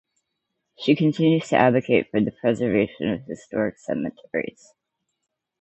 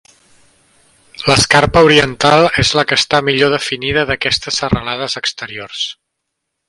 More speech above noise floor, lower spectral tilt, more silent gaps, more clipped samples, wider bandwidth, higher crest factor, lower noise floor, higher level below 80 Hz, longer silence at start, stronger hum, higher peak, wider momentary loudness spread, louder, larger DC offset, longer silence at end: second, 57 dB vs 61 dB; first, -7 dB/octave vs -3.5 dB/octave; neither; neither; second, 8.2 kHz vs 11.5 kHz; first, 20 dB vs 14 dB; first, -79 dBFS vs -74 dBFS; second, -60 dBFS vs -38 dBFS; second, 0.8 s vs 1.15 s; neither; about the same, -2 dBFS vs 0 dBFS; about the same, 11 LU vs 12 LU; second, -23 LUFS vs -13 LUFS; neither; first, 1.1 s vs 0.75 s